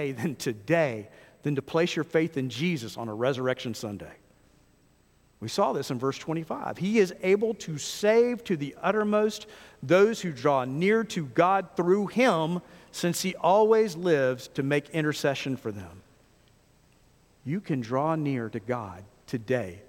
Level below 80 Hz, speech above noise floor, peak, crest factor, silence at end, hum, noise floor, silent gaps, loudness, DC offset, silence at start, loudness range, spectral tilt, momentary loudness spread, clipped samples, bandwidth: -66 dBFS; 36 dB; -8 dBFS; 20 dB; 0.05 s; none; -63 dBFS; none; -27 LUFS; under 0.1%; 0 s; 8 LU; -5.5 dB/octave; 13 LU; under 0.1%; 16.5 kHz